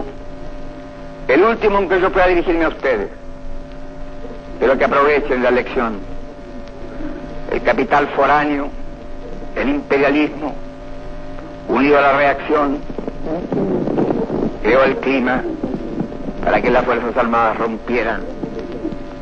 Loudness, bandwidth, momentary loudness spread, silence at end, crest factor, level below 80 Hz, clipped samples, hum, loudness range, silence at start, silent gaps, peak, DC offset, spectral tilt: -17 LUFS; 7.2 kHz; 20 LU; 0 s; 16 dB; -32 dBFS; under 0.1%; none; 2 LU; 0 s; none; -2 dBFS; 0.7%; -7 dB/octave